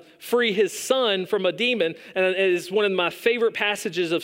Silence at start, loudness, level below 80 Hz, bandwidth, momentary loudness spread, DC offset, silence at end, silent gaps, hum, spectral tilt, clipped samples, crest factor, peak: 0.2 s; -22 LUFS; -78 dBFS; 16 kHz; 4 LU; under 0.1%; 0 s; none; none; -3.5 dB/octave; under 0.1%; 16 dB; -6 dBFS